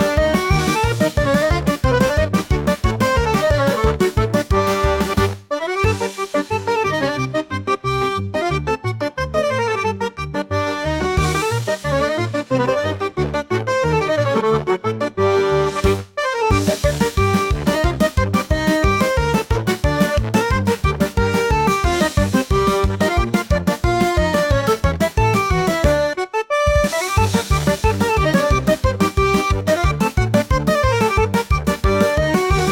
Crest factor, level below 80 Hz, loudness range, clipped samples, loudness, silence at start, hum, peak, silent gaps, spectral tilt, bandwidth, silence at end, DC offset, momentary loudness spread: 16 dB; -26 dBFS; 3 LU; under 0.1%; -18 LUFS; 0 s; none; -2 dBFS; none; -5.5 dB/octave; 17 kHz; 0 s; under 0.1%; 5 LU